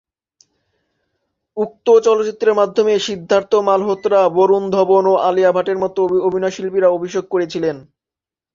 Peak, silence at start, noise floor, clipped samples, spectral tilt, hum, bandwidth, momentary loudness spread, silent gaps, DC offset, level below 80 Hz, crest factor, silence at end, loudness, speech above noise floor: -2 dBFS; 1.55 s; -88 dBFS; under 0.1%; -5.5 dB/octave; none; 7.6 kHz; 8 LU; none; under 0.1%; -62 dBFS; 14 dB; 0.75 s; -16 LUFS; 73 dB